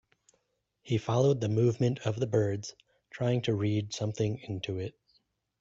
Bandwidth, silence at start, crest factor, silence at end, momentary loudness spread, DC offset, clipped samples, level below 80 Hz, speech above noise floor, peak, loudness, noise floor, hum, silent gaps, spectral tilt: 7.8 kHz; 0.85 s; 16 dB; 0.7 s; 11 LU; under 0.1%; under 0.1%; -64 dBFS; 49 dB; -14 dBFS; -30 LUFS; -78 dBFS; none; none; -6.5 dB/octave